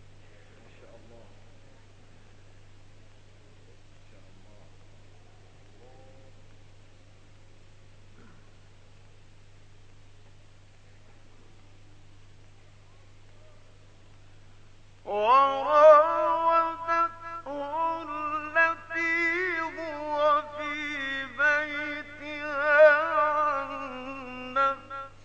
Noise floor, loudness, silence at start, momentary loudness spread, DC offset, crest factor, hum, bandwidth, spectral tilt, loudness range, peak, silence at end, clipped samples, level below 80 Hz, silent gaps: -51 dBFS; -25 LUFS; 0 s; 18 LU; under 0.1%; 24 dB; 50 Hz at -75 dBFS; 8 kHz; -4.5 dB/octave; 6 LU; -6 dBFS; 0.15 s; under 0.1%; -56 dBFS; none